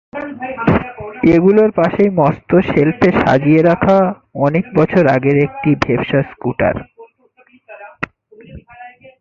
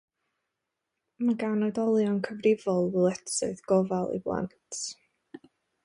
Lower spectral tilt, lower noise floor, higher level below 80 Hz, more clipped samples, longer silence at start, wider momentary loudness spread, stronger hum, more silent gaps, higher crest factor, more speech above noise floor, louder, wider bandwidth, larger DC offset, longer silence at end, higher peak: first, -9 dB/octave vs -5.5 dB/octave; second, -51 dBFS vs -84 dBFS; first, -40 dBFS vs -66 dBFS; neither; second, 0.15 s vs 1.2 s; first, 14 LU vs 10 LU; neither; neither; about the same, 14 dB vs 18 dB; second, 38 dB vs 57 dB; first, -13 LUFS vs -28 LUFS; second, 7.2 kHz vs 11 kHz; neither; about the same, 0.35 s vs 0.45 s; first, 0 dBFS vs -12 dBFS